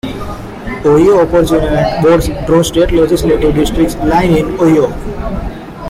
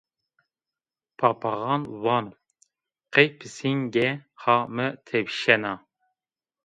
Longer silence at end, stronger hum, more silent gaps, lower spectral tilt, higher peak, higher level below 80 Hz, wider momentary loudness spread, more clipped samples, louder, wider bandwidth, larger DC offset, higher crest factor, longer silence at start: second, 0 s vs 0.9 s; neither; neither; about the same, -6.5 dB/octave vs -5.5 dB/octave; about the same, -2 dBFS vs 0 dBFS; first, -24 dBFS vs -70 dBFS; first, 14 LU vs 9 LU; neither; first, -11 LUFS vs -24 LUFS; first, 16 kHz vs 9.4 kHz; neither; second, 10 dB vs 26 dB; second, 0.05 s vs 1.2 s